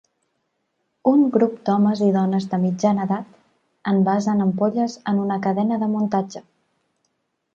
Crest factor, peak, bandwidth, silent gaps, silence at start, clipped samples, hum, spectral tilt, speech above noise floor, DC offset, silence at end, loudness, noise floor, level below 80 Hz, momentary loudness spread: 18 dB; -4 dBFS; 7.4 kHz; none; 1.05 s; under 0.1%; none; -8 dB/octave; 53 dB; under 0.1%; 1.15 s; -20 LUFS; -73 dBFS; -68 dBFS; 7 LU